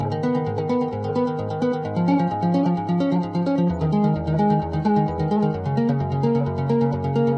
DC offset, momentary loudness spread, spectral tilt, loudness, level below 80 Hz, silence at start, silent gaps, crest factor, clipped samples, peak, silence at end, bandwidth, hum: under 0.1%; 3 LU; -9.5 dB/octave; -22 LUFS; -50 dBFS; 0 s; none; 12 dB; under 0.1%; -8 dBFS; 0 s; 6.8 kHz; none